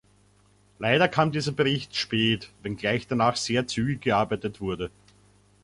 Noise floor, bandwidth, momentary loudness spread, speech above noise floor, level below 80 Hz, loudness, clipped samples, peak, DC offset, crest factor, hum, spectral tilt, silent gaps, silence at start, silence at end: -61 dBFS; 11.5 kHz; 10 LU; 35 dB; -54 dBFS; -26 LUFS; under 0.1%; -6 dBFS; under 0.1%; 20 dB; 50 Hz at -50 dBFS; -5 dB/octave; none; 0.8 s; 0.75 s